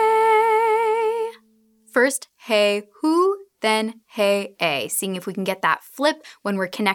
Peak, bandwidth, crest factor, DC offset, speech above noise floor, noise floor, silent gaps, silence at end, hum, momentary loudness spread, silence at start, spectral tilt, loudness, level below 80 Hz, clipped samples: -4 dBFS; 19 kHz; 18 dB; under 0.1%; 37 dB; -59 dBFS; none; 0 s; none; 10 LU; 0 s; -3.5 dB/octave; -21 LUFS; -82 dBFS; under 0.1%